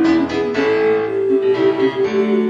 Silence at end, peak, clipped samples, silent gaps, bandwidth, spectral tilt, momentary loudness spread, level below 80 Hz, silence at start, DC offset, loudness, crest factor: 0 s; -4 dBFS; under 0.1%; none; 7.6 kHz; -6.5 dB/octave; 2 LU; -52 dBFS; 0 s; under 0.1%; -16 LUFS; 10 dB